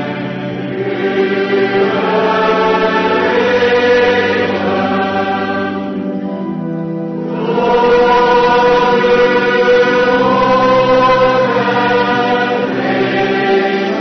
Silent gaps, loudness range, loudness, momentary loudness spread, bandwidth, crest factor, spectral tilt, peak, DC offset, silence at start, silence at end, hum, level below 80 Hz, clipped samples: none; 5 LU; -12 LUFS; 10 LU; 6.4 kHz; 10 dB; -6 dB/octave; -2 dBFS; under 0.1%; 0 s; 0 s; none; -44 dBFS; under 0.1%